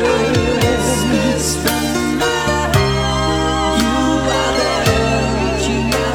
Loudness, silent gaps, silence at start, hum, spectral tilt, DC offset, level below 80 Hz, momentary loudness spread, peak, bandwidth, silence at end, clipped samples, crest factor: -15 LUFS; none; 0 s; none; -4.5 dB/octave; under 0.1%; -28 dBFS; 2 LU; -2 dBFS; 19 kHz; 0 s; under 0.1%; 14 dB